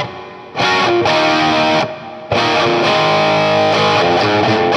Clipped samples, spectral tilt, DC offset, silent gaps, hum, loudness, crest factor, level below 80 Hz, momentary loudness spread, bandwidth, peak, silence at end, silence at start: under 0.1%; -4.5 dB/octave; under 0.1%; none; none; -13 LUFS; 12 dB; -50 dBFS; 9 LU; 11.5 kHz; -2 dBFS; 0 s; 0 s